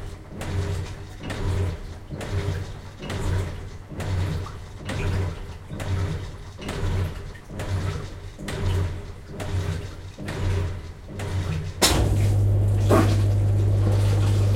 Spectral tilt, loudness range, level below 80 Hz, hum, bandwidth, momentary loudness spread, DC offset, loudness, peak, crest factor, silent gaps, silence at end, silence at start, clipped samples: -5.5 dB/octave; 9 LU; -34 dBFS; none; 16 kHz; 16 LU; under 0.1%; -25 LUFS; -4 dBFS; 20 dB; none; 0 s; 0 s; under 0.1%